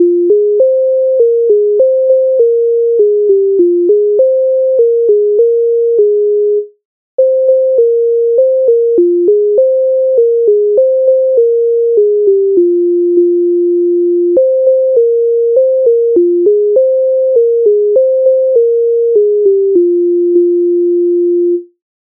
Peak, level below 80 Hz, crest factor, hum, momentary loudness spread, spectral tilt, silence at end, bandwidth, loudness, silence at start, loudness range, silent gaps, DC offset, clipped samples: 0 dBFS; -68 dBFS; 8 dB; none; 2 LU; -13.5 dB/octave; 0.4 s; 0.9 kHz; -10 LUFS; 0 s; 1 LU; 6.85-7.18 s; under 0.1%; under 0.1%